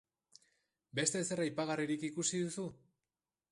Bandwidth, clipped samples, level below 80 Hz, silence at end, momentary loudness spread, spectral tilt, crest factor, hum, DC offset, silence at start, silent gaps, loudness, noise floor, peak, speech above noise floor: 11.5 kHz; under 0.1%; -78 dBFS; 0.75 s; 8 LU; -3.5 dB/octave; 24 dB; none; under 0.1%; 0.95 s; none; -37 LUFS; under -90 dBFS; -16 dBFS; over 53 dB